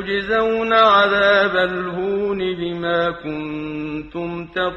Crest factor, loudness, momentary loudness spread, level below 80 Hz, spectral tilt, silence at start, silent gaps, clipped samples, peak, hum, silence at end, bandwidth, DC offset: 16 dB; -18 LUFS; 14 LU; -48 dBFS; -6 dB/octave; 0 s; none; under 0.1%; -2 dBFS; none; 0 s; 8.4 kHz; under 0.1%